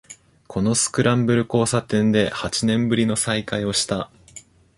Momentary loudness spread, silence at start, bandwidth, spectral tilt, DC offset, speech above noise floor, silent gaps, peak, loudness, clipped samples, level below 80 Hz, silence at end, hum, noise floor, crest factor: 6 LU; 0.1 s; 11.5 kHz; -4.5 dB/octave; under 0.1%; 26 dB; none; -4 dBFS; -20 LUFS; under 0.1%; -50 dBFS; 0.35 s; none; -46 dBFS; 18 dB